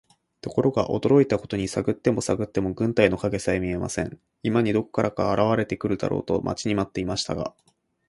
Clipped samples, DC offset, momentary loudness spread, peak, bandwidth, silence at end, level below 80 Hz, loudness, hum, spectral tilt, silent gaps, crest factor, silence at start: under 0.1%; under 0.1%; 9 LU; -4 dBFS; 11.5 kHz; 0.6 s; -48 dBFS; -24 LUFS; none; -6 dB/octave; none; 22 dB; 0.45 s